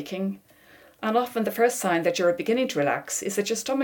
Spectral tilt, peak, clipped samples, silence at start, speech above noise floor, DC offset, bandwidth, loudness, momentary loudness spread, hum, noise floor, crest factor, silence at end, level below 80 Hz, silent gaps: -4 dB/octave; -10 dBFS; under 0.1%; 0 s; 29 dB; under 0.1%; 18 kHz; -25 LUFS; 8 LU; none; -54 dBFS; 16 dB; 0 s; -70 dBFS; none